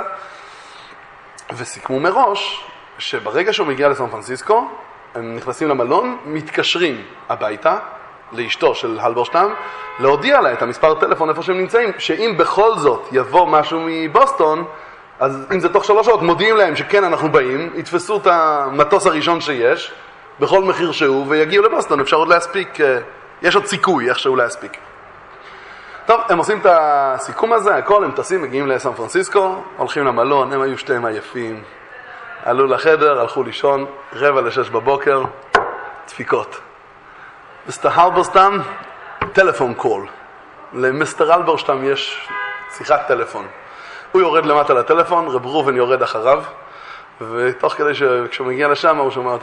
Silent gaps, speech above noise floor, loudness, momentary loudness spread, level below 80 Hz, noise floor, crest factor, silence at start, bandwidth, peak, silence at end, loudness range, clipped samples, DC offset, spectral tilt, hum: none; 26 dB; -16 LUFS; 17 LU; -56 dBFS; -41 dBFS; 16 dB; 0 s; 11 kHz; 0 dBFS; 0 s; 4 LU; under 0.1%; under 0.1%; -4.5 dB/octave; none